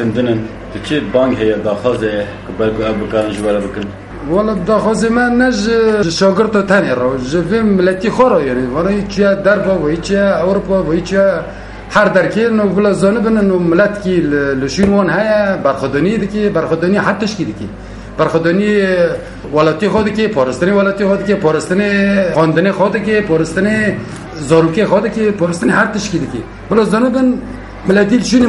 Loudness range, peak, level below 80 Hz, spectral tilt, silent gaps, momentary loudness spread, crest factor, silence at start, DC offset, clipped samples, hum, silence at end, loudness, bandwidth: 3 LU; 0 dBFS; -36 dBFS; -6 dB/octave; none; 7 LU; 12 dB; 0 s; under 0.1%; under 0.1%; none; 0 s; -13 LUFS; 11.5 kHz